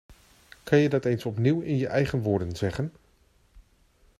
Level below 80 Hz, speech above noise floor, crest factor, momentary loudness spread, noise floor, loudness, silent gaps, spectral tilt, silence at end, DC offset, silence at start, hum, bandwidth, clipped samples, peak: -54 dBFS; 38 dB; 20 dB; 10 LU; -63 dBFS; -26 LUFS; none; -7.5 dB/octave; 0.6 s; under 0.1%; 0.1 s; none; 13.5 kHz; under 0.1%; -8 dBFS